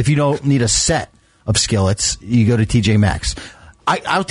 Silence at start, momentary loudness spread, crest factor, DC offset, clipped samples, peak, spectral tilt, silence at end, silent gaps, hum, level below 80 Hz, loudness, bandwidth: 0 s; 11 LU; 12 dB; under 0.1%; under 0.1%; -4 dBFS; -4.5 dB/octave; 0.05 s; none; none; -34 dBFS; -16 LUFS; 11 kHz